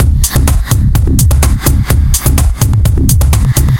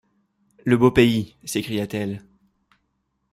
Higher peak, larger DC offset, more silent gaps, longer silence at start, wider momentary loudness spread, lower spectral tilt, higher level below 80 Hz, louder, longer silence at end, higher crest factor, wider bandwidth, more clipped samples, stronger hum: first, 0 dBFS vs -4 dBFS; neither; neither; second, 0 s vs 0.65 s; second, 2 LU vs 14 LU; about the same, -5 dB/octave vs -6 dB/octave; first, -12 dBFS vs -48 dBFS; first, -10 LUFS vs -21 LUFS; second, 0 s vs 1.15 s; second, 8 dB vs 20 dB; first, 17.5 kHz vs 15.5 kHz; first, 0.3% vs under 0.1%; neither